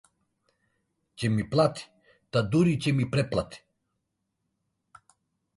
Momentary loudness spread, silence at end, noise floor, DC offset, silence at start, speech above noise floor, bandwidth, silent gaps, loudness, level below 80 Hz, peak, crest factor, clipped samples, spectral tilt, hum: 8 LU; 2 s; -80 dBFS; under 0.1%; 1.2 s; 55 dB; 11.5 kHz; none; -27 LUFS; -56 dBFS; -10 dBFS; 20 dB; under 0.1%; -7 dB/octave; none